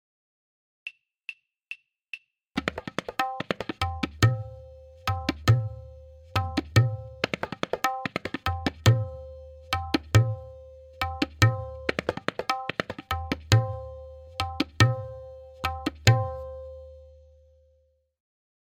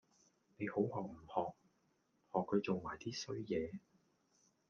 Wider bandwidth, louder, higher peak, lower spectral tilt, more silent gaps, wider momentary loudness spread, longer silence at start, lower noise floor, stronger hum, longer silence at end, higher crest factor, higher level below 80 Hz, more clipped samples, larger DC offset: first, 16 kHz vs 7.2 kHz; first, -28 LUFS vs -42 LUFS; first, 0 dBFS vs -22 dBFS; about the same, -5.5 dB/octave vs -6 dB/octave; neither; first, 19 LU vs 9 LU; first, 0.85 s vs 0.6 s; second, -67 dBFS vs -79 dBFS; neither; first, 1.55 s vs 0.9 s; first, 28 dB vs 22 dB; first, -48 dBFS vs -74 dBFS; neither; neither